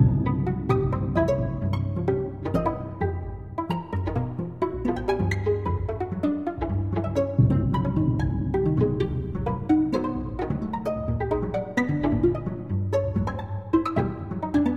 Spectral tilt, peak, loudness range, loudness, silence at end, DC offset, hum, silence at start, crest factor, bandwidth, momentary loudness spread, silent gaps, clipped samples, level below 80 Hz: -9 dB/octave; -8 dBFS; 4 LU; -26 LUFS; 0 s; 0.2%; none; 0 s; 18 dB; 7.8 kHz; 7 LU; none; under 0.1%; -38 dBFS